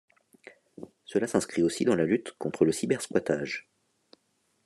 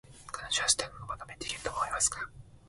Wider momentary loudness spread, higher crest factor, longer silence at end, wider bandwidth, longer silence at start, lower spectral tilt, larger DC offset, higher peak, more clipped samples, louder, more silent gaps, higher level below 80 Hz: second, 12 LU vs 15 LU; second, 20 dB vs 26 dB; first, 1.05 s vs 0 s; about the same, 13 kHz vs 12 kHz; first, 0.45 s vs 0.05 s; first, -5 dB/octave vs 0 dB/octave; neither; about the same, -8 dBFS vs -10 dBFS; neither; first, -28 LUFS vs -31 LUFS; neither; second, -68 dBFS vs -56 dBFS